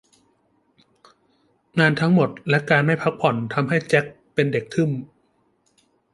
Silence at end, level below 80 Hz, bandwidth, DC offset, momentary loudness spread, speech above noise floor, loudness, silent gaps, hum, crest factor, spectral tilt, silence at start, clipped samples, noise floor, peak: 1.1 s; -62 dBFS; 11.5 kHz; under 0.1%; 6 LU; 45 dB; -21 LUFS; none; none; 22 dB; -7 dB/octave; 1.75 s; under 0.1%; -65 dBFS; -2 dBFS